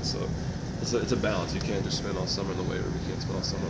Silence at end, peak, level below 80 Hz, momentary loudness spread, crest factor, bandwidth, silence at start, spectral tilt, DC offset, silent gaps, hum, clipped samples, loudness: 0 s; -12 dBFS; -42 dBFS; 5 LU; 18 dB; 8 kHz; 0 s; -5 dB/octave; under 0.1%; none; none; under 0.1%; -30 LUFS